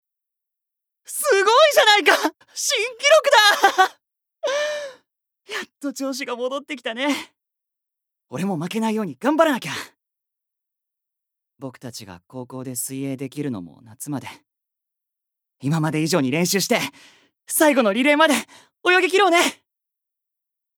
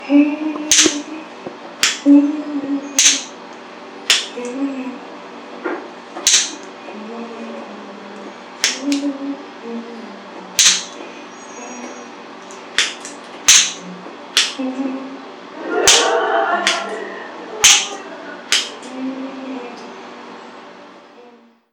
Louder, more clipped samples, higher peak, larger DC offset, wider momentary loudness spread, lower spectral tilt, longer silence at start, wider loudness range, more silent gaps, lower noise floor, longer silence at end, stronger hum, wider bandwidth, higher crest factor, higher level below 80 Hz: second, -19 LUFS vs -15 LUFS; neither; about the same, -2 dBFS vs 0 dBFS; neither; second, 20 LU vs 23 LU; first, -3 dB/octave vs 0 dB/octave; first, 1.1 s vs 0 s; first, 15 LU vs 10 LU; neither; first, -84 dBFS vs -46 dBFS; first, 1.25 s vs 0.45 s; neither; about the same, over 20 kHz vs 19 kHz; about the same, 20 dB vs 20 dB; second, -76 dBFS vs -58 dBFS